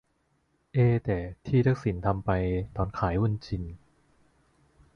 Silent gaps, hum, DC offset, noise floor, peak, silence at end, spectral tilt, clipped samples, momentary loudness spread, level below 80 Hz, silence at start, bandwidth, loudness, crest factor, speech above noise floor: none; none; under 0.1%; -72 dBFS; -12 dBFS; 1.2 s; -9.5 dB/octave; under 0.1%; 9 LU; -44 dBFS; 0.75 s; 6.6 kHz; -28 LUFS; 18 dB; 45 dB